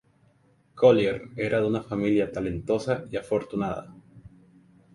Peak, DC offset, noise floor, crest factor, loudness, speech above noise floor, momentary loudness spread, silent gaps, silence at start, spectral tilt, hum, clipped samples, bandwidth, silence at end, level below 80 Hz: -6 dBFS; under 0.1%; -62 dBFS; 22 dB; -26 LUFS; 38 dB; 11 LU; none; 0.75 s; -7 dB/octave; none; under 0.1%; 11.5 kHz; 0.75 s; -54 dBFS